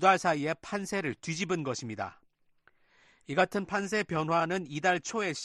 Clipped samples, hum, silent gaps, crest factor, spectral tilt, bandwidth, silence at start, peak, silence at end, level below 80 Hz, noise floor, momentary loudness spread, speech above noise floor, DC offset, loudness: under 0.1%; none; none; 22 dB; -4.5 dB/octave; 12 kHz; 0 s; -10 dBFS; 0 s; -68 dBFS; -67 dBFS; 7 LU; 37 dB; under 0.1%; -31 LUFS